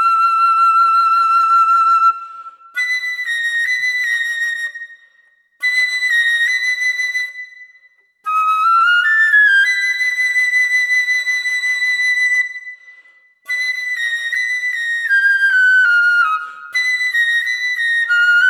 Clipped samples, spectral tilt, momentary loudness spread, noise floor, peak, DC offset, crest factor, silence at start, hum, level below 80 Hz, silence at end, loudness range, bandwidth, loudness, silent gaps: under 0.1%; 5.5 dB/octave; 11 LU; -55 dBFS; -4 dBFS; under 0.1%; 12 dB; 0 s; none; -84 dBFS; 0 s; 5 LU; 17 kHz; -14 LUFS; none